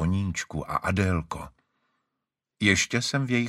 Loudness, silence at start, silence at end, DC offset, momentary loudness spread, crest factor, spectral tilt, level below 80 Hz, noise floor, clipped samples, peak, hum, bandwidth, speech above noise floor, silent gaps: -26 LUFS; 0 s; 0 s; under 0.1%; 14 LU; 22 dB; -4.5 dB/octave; -48 dBFS; -85 dBFS; under 0.1%; -6 dBFS; none; 14 kHz; 59 dB; none